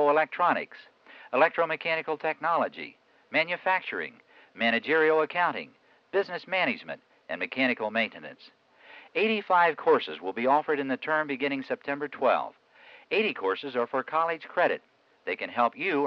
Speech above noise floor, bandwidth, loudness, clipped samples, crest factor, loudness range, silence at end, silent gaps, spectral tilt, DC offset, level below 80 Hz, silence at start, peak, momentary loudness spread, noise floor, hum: 27 dB; 6.2 kHz; -27 LUFS; under 0.1%; 18 dB; 3 LU; 0 s; none; -6.5 dB/octave; under 0.1%; -82 dBFS; 0 s; -10 dBFS; 12 LU; -54 dBFS; none